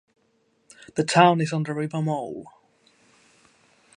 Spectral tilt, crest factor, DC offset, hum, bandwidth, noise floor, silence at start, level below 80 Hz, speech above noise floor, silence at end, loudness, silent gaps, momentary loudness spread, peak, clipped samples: -5.5 dB/octave; 24 dB; under 0.1%; none; 11 kHz; -67 dBFS; 0.95 s; -70 dBFS; 45 dB; 1.5 s; -22 LUFS; none; 16 LU; -2 dBFS; under 0.1%